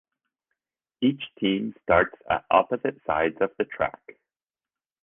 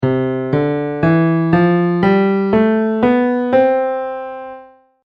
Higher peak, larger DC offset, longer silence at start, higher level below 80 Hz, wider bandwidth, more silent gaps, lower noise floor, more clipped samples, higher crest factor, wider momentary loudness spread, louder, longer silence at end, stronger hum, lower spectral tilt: second, -4 dBFS vs 0 dBFS; neither; first, 1 s vs 0 s; second, -54 dBFS vs -48 dBFS; second, 3.8 kHz vs 5.2 kHz; neither; first, under -90 dBFS vs -40 dBFS; neither; first, 22 dB vs 14 dB; second, 7 LU vs 10 LU; second, -25 LUFS vs -15 LUFS; first, 1.15 s vs 0.4 s; neither; about the same, -9 dB/octave vs -10 dB/octave